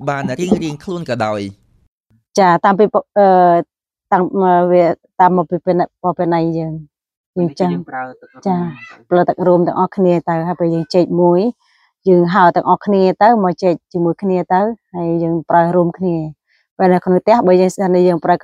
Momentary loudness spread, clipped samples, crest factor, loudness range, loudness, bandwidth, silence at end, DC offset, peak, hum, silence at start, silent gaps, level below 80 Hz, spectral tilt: 11 LU; under 0.1%; 14 dB; 5 LU; -14 LUFS; 10 kHz; 0.05 s; under 0.1%; 0 dBFS; none; 0 s; 1.88-2.01 s, 7.17-7.33 s, 16.71-16.77 s; -56 dBFS; -7.5 dB/octave